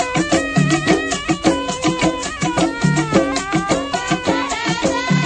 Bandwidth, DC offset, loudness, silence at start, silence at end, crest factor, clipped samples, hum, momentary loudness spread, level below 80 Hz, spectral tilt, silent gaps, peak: 9.6 kHz; under 0.1%; -18 LUFS; 0 s; 0 s; 16 dB; under 0.1%; none; 4 LU; -40 dBFS; -4.5 dB/octave; none; 0 dBFS